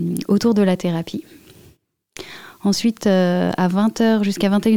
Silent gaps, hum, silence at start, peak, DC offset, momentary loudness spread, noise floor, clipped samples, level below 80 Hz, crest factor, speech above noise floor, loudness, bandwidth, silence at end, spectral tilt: none; none; 0 s; -4 dBFS; 0.4%; 17 LU; -54 dBFS; under 0.1%; -56 dBFS; 14 dB; 37 dB; -18 LUFS; 17 kHz; 0 s; -6 dB/octave